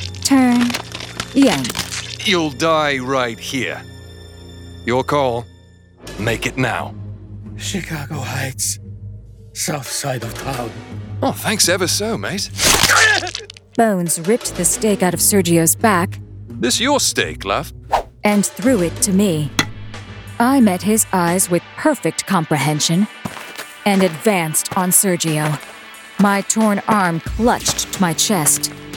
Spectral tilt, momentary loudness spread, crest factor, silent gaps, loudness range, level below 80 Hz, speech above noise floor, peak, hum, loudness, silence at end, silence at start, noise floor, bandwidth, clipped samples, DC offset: -3.5 dB/octave; 17 LU; 18 dB; none; 8 LU; -42 dBFS; 28 dB; 0 dBFS; none; -17 LUFS; 0 s; 0 s; -45 dBFS; 19.5 kHz; under 0.1%; under 0.1%